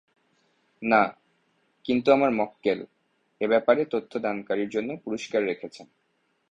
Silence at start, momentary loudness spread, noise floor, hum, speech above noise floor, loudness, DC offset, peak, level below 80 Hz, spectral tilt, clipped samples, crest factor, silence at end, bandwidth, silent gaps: 0.8 s; 12 LU; -72 dBFS; none; 47 dB; -26 LUFS; under 0.1%; -6 dBFS; -68 dBFS; -6 dB/octave; under 0.1%; 22 dB; 0.65 s; 8.8 kHz; none